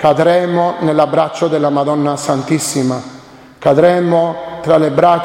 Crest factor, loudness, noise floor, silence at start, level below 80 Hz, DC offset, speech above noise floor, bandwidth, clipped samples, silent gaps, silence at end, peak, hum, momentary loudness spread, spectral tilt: 12 dB; -13 LUFS; -36 dBFS; 0 s; -52 dBFS; under 0.1%; 23 dB; 16.5 kHz; under 0.1%; none; 0 s; 0 dBFS; none; 8 LU; -5.5 dB/octave